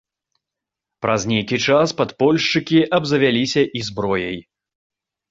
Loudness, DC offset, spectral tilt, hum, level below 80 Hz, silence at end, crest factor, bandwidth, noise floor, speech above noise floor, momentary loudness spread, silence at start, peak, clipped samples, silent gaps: -18 LUFS; under 0.1%; -5 dB/octave; none; -54 dBFS; 0.9 s; 18 dB; 7.8 kHz; -85 dBFS; 67 dB; 7 LU; 1 s; -2 dBFS; under 0.1%; none